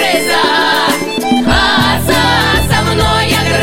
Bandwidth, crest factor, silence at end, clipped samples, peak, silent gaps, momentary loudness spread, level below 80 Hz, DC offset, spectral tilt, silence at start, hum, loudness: 16.5 kHz; 10 dB; 0 s; under 0.1%; 0 dBFS; none; 3 LU; -26 dBFS; under 0.1%; -4 dB/octave; 0 s; none; -10 LUFS